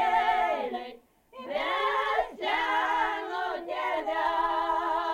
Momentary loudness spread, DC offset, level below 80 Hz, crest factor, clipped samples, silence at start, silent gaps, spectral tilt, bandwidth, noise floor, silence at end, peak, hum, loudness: 8 LU; under 0.1%; -58 dBFS; 14 dB; under 0.1%; 0 s; none; -2.5 dB/octave; 16.5 kHz; -50 dBFS; 0 s; -14 dBFS; none; -28 LUFS